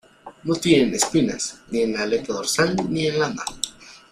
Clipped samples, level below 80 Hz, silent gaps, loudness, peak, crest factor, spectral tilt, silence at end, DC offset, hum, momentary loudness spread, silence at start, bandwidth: under 0.1%; -52 dBFS; none; -22 LUFS; -4 dBFS; 20 dB; -4 dB/octave; 0.15 s; under 0.1%; none; 11 LU; 0.25 s; 15.5 kHz